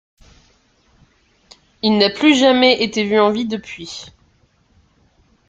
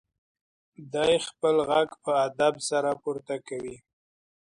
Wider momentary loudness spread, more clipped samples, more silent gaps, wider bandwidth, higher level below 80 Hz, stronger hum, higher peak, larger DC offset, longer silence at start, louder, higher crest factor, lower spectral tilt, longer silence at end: first, 18 LU vs 11 LU; neither; neither; second, 9.2 kHz vs 11 kHz; first, -56 dBFS vs -66 dBFS; neither; first, 0 dBFS vs -10 dBFS; neither; first, 1.85 s vs 0.8 s; first, -15 LUFS vs -27 LUFS; about the same, 18 dB vs 18 dB; about the same, -4 dB/octave vs -3.5 dB/octave; first, 1.4 s vs 0.75 s